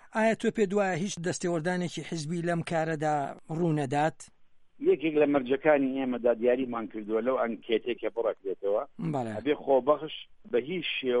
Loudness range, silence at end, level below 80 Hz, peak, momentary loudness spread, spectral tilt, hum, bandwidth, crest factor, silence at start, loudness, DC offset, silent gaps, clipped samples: 3 LU; 0 s; -66 dBFS; -10 dBFS; 8 LU; -5.5 dB/octave; none; 11.5 kHz; 18 dB; 0.05 s; -29 LUFS; under 0.1%; none; under 0.1%